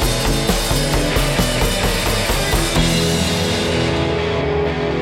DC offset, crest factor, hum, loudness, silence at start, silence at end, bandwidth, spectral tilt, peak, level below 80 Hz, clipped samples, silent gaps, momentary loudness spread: under 0.1%; 16 dB; none; -17 LUFS; 0 s; 0 s; 17 kHz; -4 dB/octave; -2 dBFS; -24 dBFS; under 0.1%; none; 3 LU